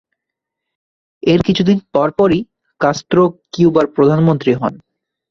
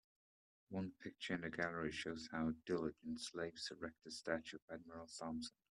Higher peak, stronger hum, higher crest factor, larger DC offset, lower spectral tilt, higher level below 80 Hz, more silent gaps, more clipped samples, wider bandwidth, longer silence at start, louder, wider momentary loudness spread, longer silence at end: first, -2 dBFS vs -24 dBFS; neither; second, 14 dB vs 22 dB; neither; first, -7 dB/octave vs -4.5 dB/octave; first, -46 dBFS vs -74 dBFS; second, none vs 4.62-4.68 s; neither; second, 7.4 kHz vs 12 kHz; first, 1.25 s vs 0.7 s; first, -14 LUFS vs -46 LUFS; about the same, 7 LU vs 9 LU; first, 0.55 s vs 0.3 s